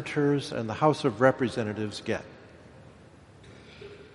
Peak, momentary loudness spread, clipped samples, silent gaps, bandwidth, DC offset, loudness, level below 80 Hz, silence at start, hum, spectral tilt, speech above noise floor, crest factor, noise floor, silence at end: -6 dBFS; 23 LU; under 0.1%; none; 11.5 kHz; under 0.1%; -27 LUFS; -62 dBFS; 0 s; none; -6.5 dB/octave; 26 dB; 24 dB; -52 dBFS; 0.05 s